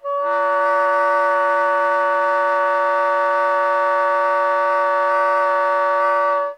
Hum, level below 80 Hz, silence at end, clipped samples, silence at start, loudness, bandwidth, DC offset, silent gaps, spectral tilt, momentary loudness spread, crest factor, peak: none; -80 dBFS; 0 s; under 0.1%; 0.05 s; -17 LUFS; 10 kHz; under 0.1%; none; -2 dB/octave; 1 LU; 10 dB; -8 dBFS